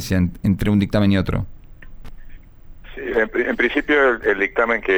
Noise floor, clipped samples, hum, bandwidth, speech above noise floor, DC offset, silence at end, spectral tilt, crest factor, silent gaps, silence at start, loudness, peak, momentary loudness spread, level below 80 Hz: -39 dBFS; under 0.1%; none; over 20 kHz; 21 dB; under 0.1%; 0 s; -7 dB/octave; 14 dB; none; 0 s; -19 LUFS; -6 dBFS; 10 LU; -36 dBFS